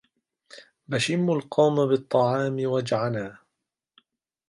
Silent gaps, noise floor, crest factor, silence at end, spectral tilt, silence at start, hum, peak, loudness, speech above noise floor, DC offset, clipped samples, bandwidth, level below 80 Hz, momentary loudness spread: none; -83 dBFS; 18 dB; 1.15 s; -6 dB/octave; 0.55 s; none; -8 dBFS; -24 LUFS; 60 dB; under 0.1%; under 0.1%; 11.5 kHz; -68 dBFS; 9 LU